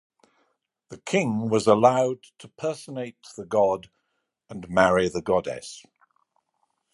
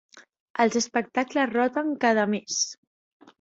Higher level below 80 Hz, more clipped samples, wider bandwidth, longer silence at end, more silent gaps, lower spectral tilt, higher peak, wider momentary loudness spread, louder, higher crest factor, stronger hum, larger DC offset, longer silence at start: first, -58 dBFS vs -70 dBFS; neither; first, 11.5 kHz vs 8 kHz; first, 1.15 s vs 0.7 s; second, none vs 0.40-0.54 s; first, -5.5 dB/octave vs -3 dB/octave; first, -4 dBFS vs -8 dBFS; first, 22 LU vs 4 LU; about the same, -24 LUFS vs -25 LUFS; about the same, 22 dB vs 20 dB; neither; neither; first, 0.9 s vs 0.15 s